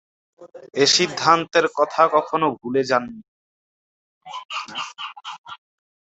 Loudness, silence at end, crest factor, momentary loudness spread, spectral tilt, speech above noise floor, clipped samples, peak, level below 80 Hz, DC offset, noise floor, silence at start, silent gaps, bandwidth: -20 LUFS; 0.45 s; 22 dB; 20 LU; -2.5 dB/octave; over 69 dB; under 0.1%; -2 dBFS; -68 dBFS; under 0.1%; under -90 dBFS; 0.4 s; 3.28-4.21 s, 4.45-4.49 s, 5.38-5.44 s; 8.2 kHz